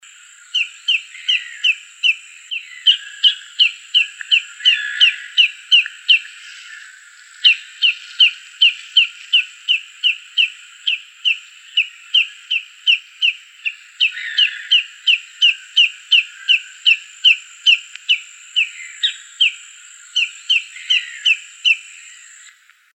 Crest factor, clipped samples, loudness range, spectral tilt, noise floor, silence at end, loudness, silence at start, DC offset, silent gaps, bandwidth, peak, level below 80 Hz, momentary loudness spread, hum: 18 dB; under 0.1%; 4 LU; 13.5 dB/octave; -48 dBFS; 1.15 s; -15 LUFS; 0.55 s; under 0.1%; none; 9.8 kHz; 0 dBFS; under -90 dBFS; 8 LU; none